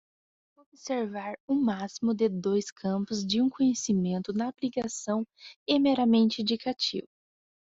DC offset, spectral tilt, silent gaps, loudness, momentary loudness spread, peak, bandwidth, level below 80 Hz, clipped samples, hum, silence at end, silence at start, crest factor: under 0.1%; -5 dB/octave; 1.40-1.48 s, 2.72-2.76 s, 5.56-5.66 s; -28 LUFS; 10 LU; -10 dBFS; 7.8 kHz; -68 dBFS; under 0.1%; none; 0.75 s; 0.85 s; 18 dB